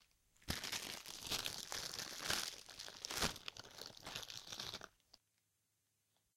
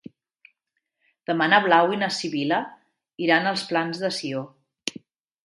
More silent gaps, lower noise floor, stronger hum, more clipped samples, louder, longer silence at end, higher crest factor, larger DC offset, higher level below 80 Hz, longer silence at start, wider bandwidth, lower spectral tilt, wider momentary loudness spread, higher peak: neither; first, -84 dBFS vs -79 dBFS; neither; neither; second, -44 LUFS vs -23 LUFS; first, 1.2 s vs 0.55 s; first, 32 dB vs 24 dB; neither; first, -66 dBFS vs -74 dBFS; second, 0.4 s vs 1.3 s; first, 16.5 kHz vs 11.5 kHz; second, -1 dB/octave vs -4 dB/octave; second, 12 LU vs 15 LU; second, -18 dBFS vs -2 dBFS